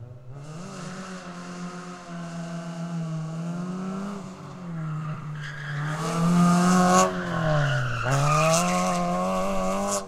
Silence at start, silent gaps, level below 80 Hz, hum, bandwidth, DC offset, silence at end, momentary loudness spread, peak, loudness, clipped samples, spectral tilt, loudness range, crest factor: 0 s; none; -46 dBFS; none; 14.5 kHz; under 0.1%; 0 s; 18 LU; -4 dBFS; -25 LUFS; under 0.1%; -5.5 dB/octave; 12 LU; 22 dB